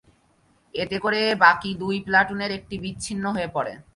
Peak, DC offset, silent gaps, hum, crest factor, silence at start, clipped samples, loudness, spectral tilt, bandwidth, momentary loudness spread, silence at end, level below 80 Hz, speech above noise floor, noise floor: -2 dBFS; under 0.1%; none; none; 22 dB; 0.75 s; under 0.1%; -23 LUFS; -4 dB/octave; 11.5 kHz; 14 LU; 0.15 s; -54 dBFS; 39 dB; -62 dBFS